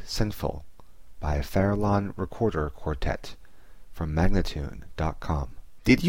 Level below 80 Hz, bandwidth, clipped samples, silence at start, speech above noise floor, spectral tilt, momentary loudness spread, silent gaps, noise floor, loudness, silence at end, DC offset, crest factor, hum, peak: -34 dBFS; 16.5 kHz; under 0.1%; 0 s; 23 dB; -6.5 dB/octave; 11 LU; none; -50 dBFS; -29 LUFS; 0 s; 0.8%; 20 dB; none; -8 dBFS